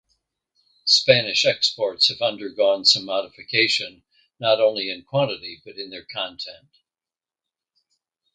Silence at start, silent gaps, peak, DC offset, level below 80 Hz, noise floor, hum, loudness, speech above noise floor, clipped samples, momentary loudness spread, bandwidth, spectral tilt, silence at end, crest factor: 0.85 s; none; 0 dBFS; under 0.1%; -68 dBFS; under -90 dBFS; none; -20 LUFS; over 68 dB; under 0.1%; 18 LU; 9.4 kHz; -2.5 dB/octave; 1.8 s; 24 dB